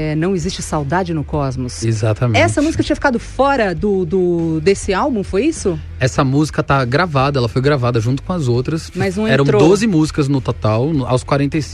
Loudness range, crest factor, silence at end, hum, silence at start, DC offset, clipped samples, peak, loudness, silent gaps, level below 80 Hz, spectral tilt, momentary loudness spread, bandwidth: 1 LU; 14 dB; 0 s; none; 0 s; under 0.1%; under 0.1%; -2 dBFS; -16 LUFS; none; -34 dBFS; -6 dB/octave; 6 LU; 12 kHz